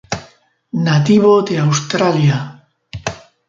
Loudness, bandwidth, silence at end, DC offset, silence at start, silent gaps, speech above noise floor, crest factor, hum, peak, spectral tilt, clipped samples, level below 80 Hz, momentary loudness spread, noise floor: -14 LUFS; 7.6 kHz; 0.3 s; under 0.1%; 0.1 s; none; 36 dB; 14 dB; none; -2 dBFS; -6 dB/octave; under 0.1%; -48 dBFS; 16 LU; -49 dBFS